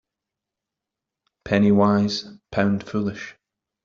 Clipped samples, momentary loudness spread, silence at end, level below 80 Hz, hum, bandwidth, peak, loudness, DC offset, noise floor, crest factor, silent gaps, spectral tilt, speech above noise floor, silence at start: under 0.1%; 13 LU; 0.55 s; -56 dBFS; none; 7.2 kHz; -4 dBFS; -21 LUFS; under 0.1%; -86 dBFS; 20 dB; none; -7 dB/octave; 66 dB; 1.45 s